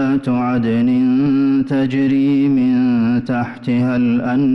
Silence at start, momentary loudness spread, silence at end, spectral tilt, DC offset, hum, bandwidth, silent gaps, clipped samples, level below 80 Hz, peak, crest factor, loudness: 0 s; 4 LU; 0 s; -9 dB/octave; under 0.1%; none; 5.8 kHz; none; under 0.1%; -50 dBFS; -8 dBFS; 6 dB; -16 LUFS